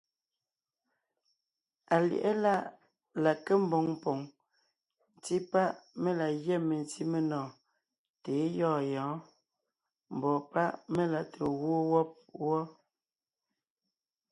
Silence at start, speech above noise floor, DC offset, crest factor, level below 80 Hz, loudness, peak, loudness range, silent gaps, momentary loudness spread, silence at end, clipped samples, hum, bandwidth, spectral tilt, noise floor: 1.9 s; over 59 dB; under 0.1%; 20 dB; -74 dBFS; -32 LUFS; -14 dBFS; 4 LU; 7.98-8.14 s; 10 LU; 1.6 s; under 0.1%; none; 11.5 kHz; -7 dB/octave; under -90 dBFS